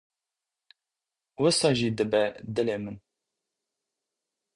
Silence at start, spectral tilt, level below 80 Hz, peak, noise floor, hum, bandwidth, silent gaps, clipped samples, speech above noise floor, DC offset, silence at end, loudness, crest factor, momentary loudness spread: 1.4 s; -4.5 dB/octave; -64 dBFS; -10 dBFS; -89 dBFS; none; 11.5 kHz; none; under 0.1%; 63 dB; under 0.1%; 1.6 s; -26 LUFS; 20 dB; 13 LU